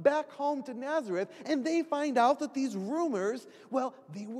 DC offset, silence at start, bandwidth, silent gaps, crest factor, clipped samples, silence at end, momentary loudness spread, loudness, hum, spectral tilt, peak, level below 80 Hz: under 0.1%; 0 s; 12.5 kHz; none; 20 dB; under 0.1%; 0 s; 9 LU; -32 LUFS; none; -5 dB/octave; -12 dBFS; under -90 dBFS